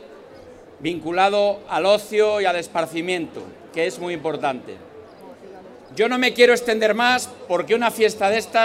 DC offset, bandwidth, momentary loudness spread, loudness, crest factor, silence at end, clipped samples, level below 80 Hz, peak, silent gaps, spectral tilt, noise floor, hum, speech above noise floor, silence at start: under 0.1%; 16 kHz; 15 LU; -20 LUFS; 20 dB; 0 s; under 0.1%; -62 dBFS; -2 dBFS; none; -3.5 dB/octave; -43 dBFS; none; 23 dB; 0 s